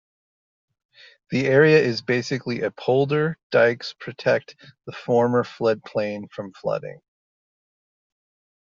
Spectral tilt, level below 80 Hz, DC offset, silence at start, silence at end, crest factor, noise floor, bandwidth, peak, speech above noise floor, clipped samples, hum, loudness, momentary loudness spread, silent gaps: -5 dB/octave; -66 dBFS; under 0.1%; 1.3 s; 1.75 s; 20 dB; under -90 dBFS; 7.4 kHz; -4 dBFS; over 68 dB; under 0.1%; none; -22 LUFS; 16 LU; 3.43-3.50 s